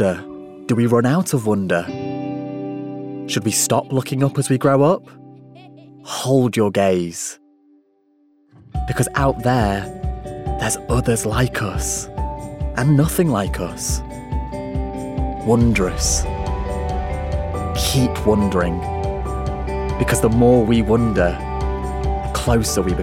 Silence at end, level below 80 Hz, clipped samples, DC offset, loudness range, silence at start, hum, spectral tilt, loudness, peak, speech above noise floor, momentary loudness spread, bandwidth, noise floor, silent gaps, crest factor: 0 s; -30 dBFS; under 0.1%; under 0.1%; 4 LU; 0 s; none; -5.5 dB/octave; -20 LUFS; -4 dBFS; 41 dB; 12 LU; 16.5 kHz; -59 dBFS; none; 16 dB